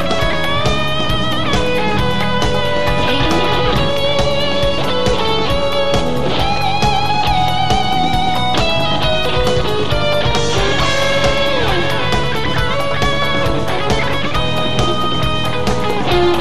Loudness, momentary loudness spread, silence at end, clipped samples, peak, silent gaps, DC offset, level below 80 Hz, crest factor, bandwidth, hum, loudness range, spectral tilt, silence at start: -16 LUFS; 3 LU; 0 s; under 0.1%; -2 dBFS; none; 10%; -28 dBFS; 14 dB; 15.5 kHz; none; 1 LU; -5 dB/octave; 0 s